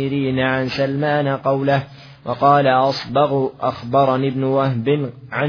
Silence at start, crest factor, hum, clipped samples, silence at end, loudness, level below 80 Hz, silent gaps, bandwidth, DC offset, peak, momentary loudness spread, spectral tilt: 0 s; 16 dB; none; under 0.1%; 0 s; -18 LUFS; -54 dBFS; none; 5.4 kHz; under 0.1%; -2 dBFS; 7 LU; -8 dB/octave